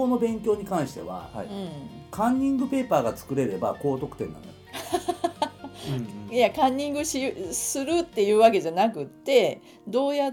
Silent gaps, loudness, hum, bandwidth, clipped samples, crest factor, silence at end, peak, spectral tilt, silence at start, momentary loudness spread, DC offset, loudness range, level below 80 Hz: none; -26 LUFS; none; 18 kHz; under 0.1%; 20 dB; 0 s; -6 dBFS; -4.5 dB/octave; 0 s; 14 LU; under 0.1%; 5 LU; -56 dBFS